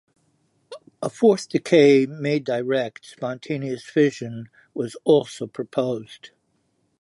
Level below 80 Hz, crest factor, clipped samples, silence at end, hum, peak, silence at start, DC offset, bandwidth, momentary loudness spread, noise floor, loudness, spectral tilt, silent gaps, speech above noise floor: -72 dBFS; 18 dB; under 0.1%; 0.85 s; none; -4 dBFS; 0.7 s; under 0.1%; 11.5 kHz; 16 LU; -69 dBFS; -22 LUFS; -6 dB/octave; none; 47 dB